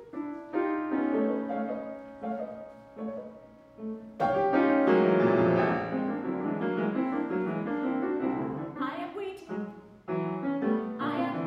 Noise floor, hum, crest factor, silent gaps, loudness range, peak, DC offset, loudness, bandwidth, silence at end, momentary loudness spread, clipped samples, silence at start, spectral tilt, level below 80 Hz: -51 dBFS; none; 18 dB; none; 7 LU; -12 dBFS; under 0.1%; -29 LUFS; 6.2 kHz; 0 s; 16 LU; under 0.1%; 0 s; -9 dB/octave; -66 dBFS